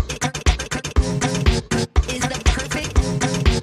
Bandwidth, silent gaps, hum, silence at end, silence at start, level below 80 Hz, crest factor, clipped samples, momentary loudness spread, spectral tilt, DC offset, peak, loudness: 13.5 kHz; none; none; 0 s; 0 s; -22 dBFS; 18 dB; under 0.1%; 3 LU; -4.5 dB/octave; under 0.1%; -2 dBFS; -21 LUFS